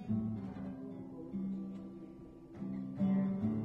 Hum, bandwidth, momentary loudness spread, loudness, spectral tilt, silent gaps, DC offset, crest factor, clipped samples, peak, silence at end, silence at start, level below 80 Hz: none; 3.9 kHz; 17 LU; -40 LUFS; -11 dB/octave; none; under 0.1%; 14 dB; under 0.1%; -24 dBFS; 0 s; 0 s; -64 dBFS